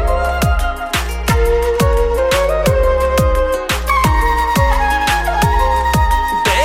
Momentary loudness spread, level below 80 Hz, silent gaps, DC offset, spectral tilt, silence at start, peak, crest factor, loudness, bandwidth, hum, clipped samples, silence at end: 3 LU; -18 dBFS; none; under 0.1%; -5 dB/octave; 0 s; -2 dBFS; 12 dB; -15 LUFS; 16.5 kHz; none; under 0.1%; 0 s